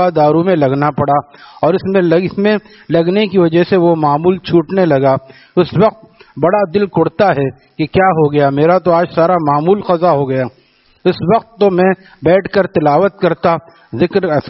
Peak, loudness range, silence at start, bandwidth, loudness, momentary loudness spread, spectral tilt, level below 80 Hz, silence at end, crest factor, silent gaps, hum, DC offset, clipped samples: 0 dBFS; 1 LU; 0 s; 5.8 kHz; -13 LUFS; 6 LU; -6 dB/octave; -48 dBFS; 0 s; 12 dB; none; none; under 0.1%; under 0.1%